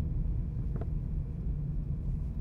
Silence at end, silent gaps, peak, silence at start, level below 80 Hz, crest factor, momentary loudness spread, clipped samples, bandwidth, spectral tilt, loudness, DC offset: 0 s; none; -22 dBFS; 0 s; -36 dBFS; 10 dB; 2 LU; under 0.1%; 2.7 kHz; -11.5 dB/octave; -36 LUFS; under 0.1%